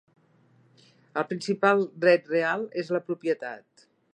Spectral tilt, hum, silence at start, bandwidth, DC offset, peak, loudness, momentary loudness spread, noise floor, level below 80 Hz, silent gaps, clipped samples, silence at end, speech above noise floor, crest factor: -6 dB/octave; none; 1.15 s; 9.6 kHz; under 0.1%; -6 dBFS; -26 LUFS; 11 LU; -62 dBFS; -82 dBFS; none; under 0.1%; 0.55 s; 36 dB; 22 dB